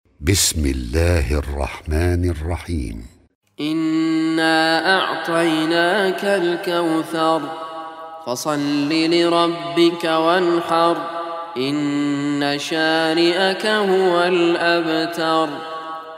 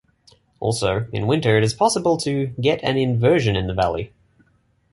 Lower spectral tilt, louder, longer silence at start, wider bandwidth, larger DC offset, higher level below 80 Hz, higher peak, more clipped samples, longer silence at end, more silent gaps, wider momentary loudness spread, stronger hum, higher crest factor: about the same, -4.5 dB/octave vs -5.5 dB/octave; about the same, -19 LUFS vs -20 LUFS; second, 0.2 s vs 0.6 s; first, 16 kHz vs 11.5 kHz; neither; first, -34 dBFS vs -44 dBFS; about the same, 0 dBFS vs -2 dBFS; neither; second, 0 s vs 0.85 s; first, 3.35-3.41 s vs none; first, 11 LU vs 7 LU; neither; about the same, 18 dB vs 18 dB